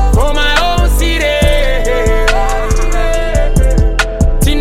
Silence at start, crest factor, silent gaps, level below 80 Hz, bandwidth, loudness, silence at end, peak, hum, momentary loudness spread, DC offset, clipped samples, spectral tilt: 0 s; 10 dB; none; -12 dBFS; 15.5 kHz; -13 LUFS; 0 s; 0 dBFS; none; 4 LU; under 0.1%; under 0.1%; -4.5 dB/octave